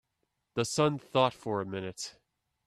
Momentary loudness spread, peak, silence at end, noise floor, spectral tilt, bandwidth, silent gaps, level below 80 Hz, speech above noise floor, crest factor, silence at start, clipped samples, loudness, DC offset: 12 LU; -10 dBFS; 0.55 s; -81 dBFS; -4.5 dB/octave; 14 kHz; none; -68 dBFS; 50 dB; 22 dB; 0.55 s; under 0.1%; -31 LUFS; under 0.1%